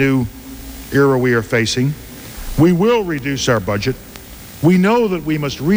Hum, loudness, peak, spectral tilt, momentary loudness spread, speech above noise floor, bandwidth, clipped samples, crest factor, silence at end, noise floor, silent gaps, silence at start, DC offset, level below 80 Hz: none; -16 LUFS; -2 dBFS; -6 dB/octave; 19 LU; 20 dB; over 20 kHz; under 0.1%; 14 dB; 0 s; -35 dBFS; none; 0 s; under 0.1%; -36 dBFS